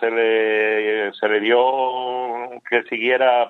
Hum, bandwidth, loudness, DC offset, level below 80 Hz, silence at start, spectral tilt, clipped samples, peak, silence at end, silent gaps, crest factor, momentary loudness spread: none; 4.2 kHz; -19 LUFS; under 0.1%; -80 dBFS; 0 s; -5.5 dB/octave; under 0.1%; -2 dBFS; 0 s; none; 16 dB; 8 LU